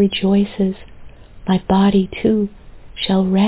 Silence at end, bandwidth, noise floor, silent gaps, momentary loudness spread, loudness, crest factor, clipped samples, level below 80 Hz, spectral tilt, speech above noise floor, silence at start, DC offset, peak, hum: 0 s; 4 kHz; -37 dBFS; none; 13 LU; -17 LUFS; 14 dB; under 0.1%; -42 dBFS; -11.5 dB/octave; 21 dB; 0 s; under 0.1%; -4 dBFS; none